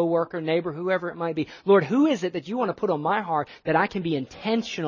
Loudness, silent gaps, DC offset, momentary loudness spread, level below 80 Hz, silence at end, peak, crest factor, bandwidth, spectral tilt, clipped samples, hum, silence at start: -25 LUFS; none; under 0.1%; 8 LU; -64 dBFS; 0 s; -6 dBFS; 18 dB; 7.4 kHz; -6.5 dB/octave; under 0.1%; none; 0 s